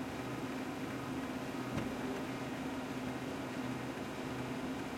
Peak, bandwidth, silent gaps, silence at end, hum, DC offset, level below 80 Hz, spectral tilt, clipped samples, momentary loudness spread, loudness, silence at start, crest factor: -26 dBFS; 16.5 kHz; none; 0 s; none; under 0.1%; -62 dBFS; -5.5 dB/octave; under 0.1%; 2 LU; -41 LUFS; 0 s; 14 dB